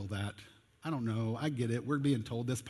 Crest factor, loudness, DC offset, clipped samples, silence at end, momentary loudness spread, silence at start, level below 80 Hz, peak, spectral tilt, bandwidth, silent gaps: 16 dB; -36 LUFS; under 0.1%; under 0.1%; 0 s; 10 LU; 0 s; -62 dBFS; -20 dBFS; -6.5 dB/octave; 12.5 kHz; none